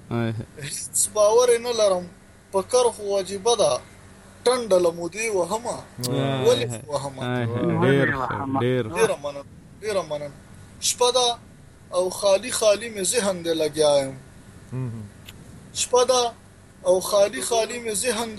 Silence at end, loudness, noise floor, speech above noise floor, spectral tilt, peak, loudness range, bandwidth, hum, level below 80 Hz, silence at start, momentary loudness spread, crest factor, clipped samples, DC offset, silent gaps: 0 s; -23 LUFS; -46 dBFS; 24 dB; -3.5 dB/octave; -6 dBFS; 3 LU; 15 kHz; none; -54 dBFS; 0 s; 13 LU; 16 dB; under 0.1%; under 0.1%; none